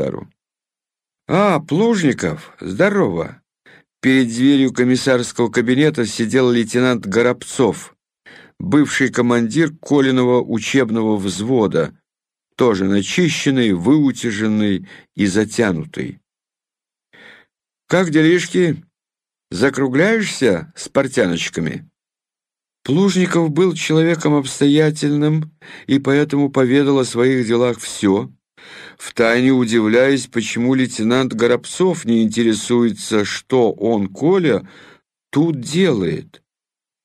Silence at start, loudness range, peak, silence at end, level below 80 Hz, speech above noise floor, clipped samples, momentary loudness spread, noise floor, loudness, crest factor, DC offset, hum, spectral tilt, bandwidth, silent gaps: 0 s; 3 LU; -2 dBFS; 0.8 s; -56 dBFS; 73 dB; under 0.1%; 8 LU; -89 dBFS; -16 LUFS; 14 dB; under 0.1%; none; -5.5 dB/octave; 14 kHz; none